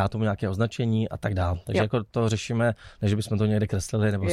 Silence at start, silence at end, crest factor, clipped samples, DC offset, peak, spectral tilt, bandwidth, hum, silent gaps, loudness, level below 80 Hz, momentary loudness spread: 0 s; 0 s; 14 dB; under 0.1%; under 0.1%; -10 dBFS; -6.5 dB/octave; 12.5 kHz; none; none; -26 LUFS; -46 dBFS; 3 LU